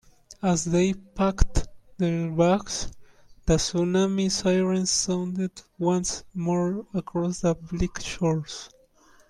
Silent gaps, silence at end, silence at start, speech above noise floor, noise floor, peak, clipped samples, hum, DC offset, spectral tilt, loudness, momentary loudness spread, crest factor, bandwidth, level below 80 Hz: none; 0.6 s; 0.3 s; 32 dB; -57 dBFS; -2 dBFS; under 0.1%; none; under 0.1%; -5 dB/octave; -26 LUFS; 9 LU; 24 dB; 12 kHz; -36 dBFS